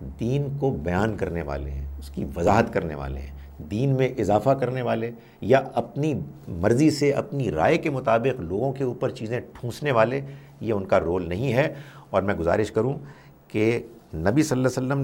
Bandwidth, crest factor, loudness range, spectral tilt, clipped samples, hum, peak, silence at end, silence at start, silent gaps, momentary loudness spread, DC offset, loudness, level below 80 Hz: 16.5 kHz; 20 dB; 2 LU; -7 dB/octave; under 0.1%; none; -4 dBFS; 0 s; 0 s; none; 13 LU; under 0.1%; -24 LUFS; -42 dBFS